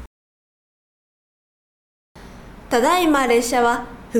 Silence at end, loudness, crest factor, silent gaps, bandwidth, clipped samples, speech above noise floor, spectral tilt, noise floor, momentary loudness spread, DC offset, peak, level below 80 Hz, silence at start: 0 s; -18 LUFS; 18 dB; 0.07-2.15 s; 18 kHz; under 0.1%; 23 dB; -3 dB/octave; -40 dBFS; 6 LU; under 0.1%; -4 dBFS; -46 dBFS; 0 s